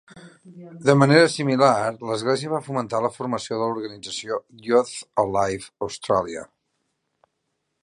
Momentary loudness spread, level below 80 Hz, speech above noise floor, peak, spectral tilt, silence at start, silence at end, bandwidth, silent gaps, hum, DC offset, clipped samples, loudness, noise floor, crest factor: 14 LU; -60 dBFS; 54 dB; 0 dBFS; -5.5 dB/octave; 0.15 s; 1.4 s; 11.5 kHz; none; none; under 0.1%; under 0.1%; -22 LUFS; -76 dBFS; 22 dB